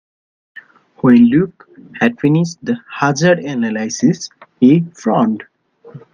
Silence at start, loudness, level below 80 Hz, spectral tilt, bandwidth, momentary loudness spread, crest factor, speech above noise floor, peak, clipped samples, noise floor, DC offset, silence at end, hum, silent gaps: 1.05 s; -15 LUFS; -58 dBFS; -6.5 dB/octave; 7.4 kHz; 12 LU; 16 dB; 26 dB; 0 dBFS; under 0.1%; -39 dBFS; under 0.1%; 0.15 s; none; none